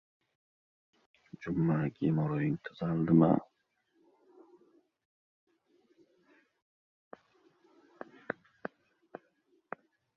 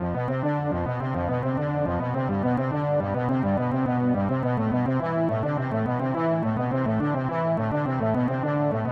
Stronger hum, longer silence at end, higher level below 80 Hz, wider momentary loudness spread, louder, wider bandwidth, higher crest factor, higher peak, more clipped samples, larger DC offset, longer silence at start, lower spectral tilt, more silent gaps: neither; first, 1.85 s vs 0 s; second, -68 dBFS vs -50 dBFS; first, 26 LU vs 2 LU; second, -31 LUFS vs -25 LUFS; second, 5 kHz vs 5.8 kHz; first, 24 dB vs 12 dB; about the same, -12 dBFS vs -12 dBFS; neither; neither; first, 1.4 s vs 0 s; about the same, -10.5 dB/octave vs -10.5 dB/octave; first, 5.05-5.47 s, 6.62-7.11 s vs none